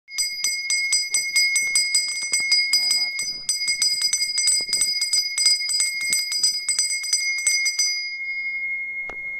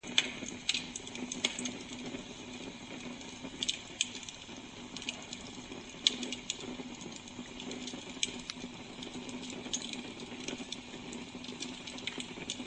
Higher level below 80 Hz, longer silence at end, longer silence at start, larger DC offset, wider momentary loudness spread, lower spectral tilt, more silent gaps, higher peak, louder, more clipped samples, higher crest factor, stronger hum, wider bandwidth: about the same, -62 dBFS vs -64 dBFS; about the same, 0 s vs 0 s; about the same, 0.1 s vs 0.05 s; neither; second, 7 LU vs 11 LU; second, 4.5 dB/octave vs -1.5 dB/octave; neither; first, -4 dBFS vs -8 dBFS; first, -19 LUFS vs -39 LUFS; neither; second, 18 dB vs 34 dB; neither; first, 15.5 kHz vs 9 kHz